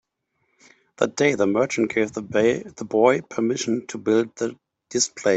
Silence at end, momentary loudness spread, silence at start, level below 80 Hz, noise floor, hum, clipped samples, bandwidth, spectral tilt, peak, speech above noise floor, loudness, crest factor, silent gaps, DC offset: 0 s; 8 LU; 1 s; -64 dBFS; -73 dBFS; none; under 0.1%; 8.4 kHz; -4 dB/octave; -4 dBFS; 51 dB; -22 LUFS; 20 dB; none; under 0.1%